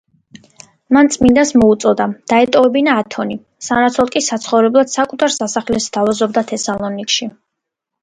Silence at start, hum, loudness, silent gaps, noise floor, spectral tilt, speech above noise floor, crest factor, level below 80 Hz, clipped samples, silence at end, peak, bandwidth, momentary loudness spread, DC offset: 0.9 s; none; -14 LUFS; none; -78 dBFS; -3.5 dB/octave; 65 dB; 14 dB; -46 dBFS; under 0.1%; 0.7 s; 0 dBFS; 9.6 kHz; 9 LU; under 0.1%